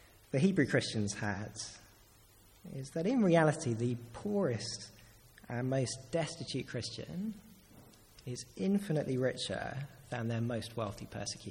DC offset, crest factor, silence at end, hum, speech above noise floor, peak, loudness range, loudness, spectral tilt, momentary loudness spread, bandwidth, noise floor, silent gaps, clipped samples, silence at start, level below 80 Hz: under 0.1%; 22 dB; 0 s; none; 27 dB; -14 dBFS; 6 LU; -35 LUFS; -5.5 dB/octave; 15 LU; 17 kHz; -62 dBFS; none; under 0.1%; 0.35 s; -64 dBFS